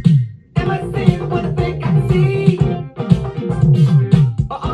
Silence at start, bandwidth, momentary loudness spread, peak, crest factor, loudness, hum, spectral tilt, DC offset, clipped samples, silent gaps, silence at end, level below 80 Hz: 0 s; 9.4 kHz; 8 LU; 0 dBFS; 14 dB; -16 LUFS; none; -9 dB/octave; under 0.1%; 0.2%; none; 0 s; -32 dBFS